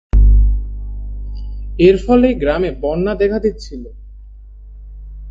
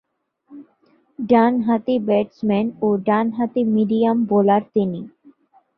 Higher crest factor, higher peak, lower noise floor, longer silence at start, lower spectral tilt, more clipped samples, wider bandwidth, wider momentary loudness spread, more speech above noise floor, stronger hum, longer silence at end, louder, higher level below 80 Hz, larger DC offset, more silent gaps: about the same, 16 dB vs 18 dB; about the same, 0 dBFS vs -2 dBFS; second, -36 dBFS vs -60 dBFS; second, 0.15 s vs 0.5 s; second, -8.5 dB/octave vs -10.5 dB/octave; neither; first, 7.4 kHz vs 5.2 kHz; first, 20 LU vs 6 LU; second, 22 dB vs 41 dB; first, 50 Hz at -25 dBFS vs none; second, 0 s vs 0.7 s; first, -15 LUFS vs -19 LUFS; first, -18 dBFS vs -62 dBFS; neither; neither